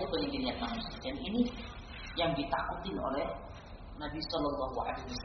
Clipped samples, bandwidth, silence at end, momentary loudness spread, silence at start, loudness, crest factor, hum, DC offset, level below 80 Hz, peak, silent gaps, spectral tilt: under 0.1%; 6.2 kHz; 0 s; 12 LU; 0 s; -36 LUFS; 18 dB; none; under 0.1%; -48 dBFS; -18 dBFS; none; -3.5 dB/octave